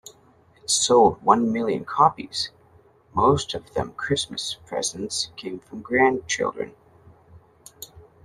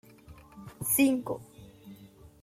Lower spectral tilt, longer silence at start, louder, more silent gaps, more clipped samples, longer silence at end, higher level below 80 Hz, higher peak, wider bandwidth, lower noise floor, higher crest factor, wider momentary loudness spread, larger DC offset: about the same, -3.5 dB/octave vs -4 dB/octave; first, 0.7 s vs 0.3 s; first, -22 LUFS vs -28 LUFS; neither; neither; about the same, 0.25 s vs 0.15 s; first, -54 dBFS vs -62 dBFS; first, -2 dBFS vs -14 dBFS; second, 13.5 kHz vs 16 kHz; about the same, -56 dBFS vs -53 dBFS; about the same, 22 dB vs 20 dB; second, 17 LU vs 26 LU; neither